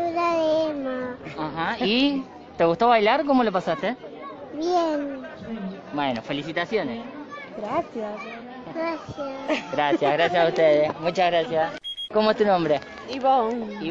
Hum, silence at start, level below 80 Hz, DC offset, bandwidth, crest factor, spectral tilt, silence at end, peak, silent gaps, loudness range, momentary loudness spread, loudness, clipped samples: none; 0 s; -58 dBFS; under 0.1%; 10.5 kHz; 18 dB; -5.5 dB/octave; 0 s; -6 dBFS; none; 8 LU; 16 LU; -24 LUFS; under 0.1%